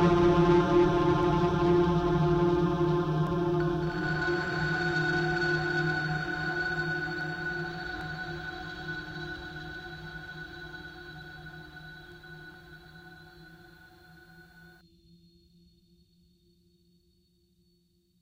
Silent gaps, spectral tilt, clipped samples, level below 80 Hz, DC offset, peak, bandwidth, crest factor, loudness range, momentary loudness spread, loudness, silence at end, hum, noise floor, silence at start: none; -7 dB/octave; under 0.1%; -48 dBFS; under 0.1%; -12 dBFS; 7.8 kHz; 18 dB; 22 LU; 22 LU; -28 LUFS; 3.8 s; none; -69 dBFS; 0 s